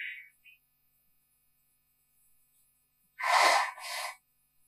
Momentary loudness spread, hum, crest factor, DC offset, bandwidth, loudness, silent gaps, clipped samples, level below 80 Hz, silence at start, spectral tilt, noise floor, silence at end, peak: 18 LU; none; 24 dB; under 0.1%; 15.5 kHz; -28 LUFS; none; under 0.1%; -88 dBFS; 0 s; 2.5 dB/octave; -73 dBFS; 0.55 s; -12 dBFS